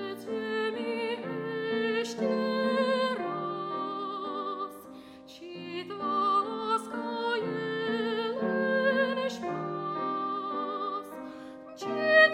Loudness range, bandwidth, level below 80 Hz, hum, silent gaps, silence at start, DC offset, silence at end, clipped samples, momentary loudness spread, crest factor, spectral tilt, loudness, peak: 4 LU; 15.5 kHz; -76 dBFS; none; none; 0 s; under 0.1%; 0 s; under 0.1%; 13 LU; 20 dB; -5 dB/octave; -30 LUFS; -10 dBFS